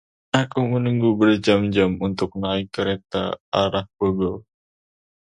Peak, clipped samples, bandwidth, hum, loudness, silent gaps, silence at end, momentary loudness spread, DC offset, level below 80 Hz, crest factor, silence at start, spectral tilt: 0 dBFS; under 0.1%; 10.5 kHz; none; -21 LUFS; 3.40-3.52 s; 0.8 s; 8 LU; under 0.1%; -48 dBFS; 22 dB; 0.35 s; -6.5 dB/octave